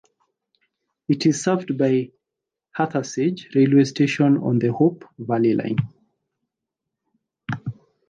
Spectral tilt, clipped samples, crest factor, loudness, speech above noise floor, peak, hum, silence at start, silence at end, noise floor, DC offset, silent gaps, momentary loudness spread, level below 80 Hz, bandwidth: -6.5 dB/octave; under 0.1%; 18 dB; -21 LUFS; 65 dB; -4 dBFS; none; 1.1 s; 0.35 s; -85 dBFS; under 0.1%; none; 18 LU; -64 dBFS; 9.4 kHz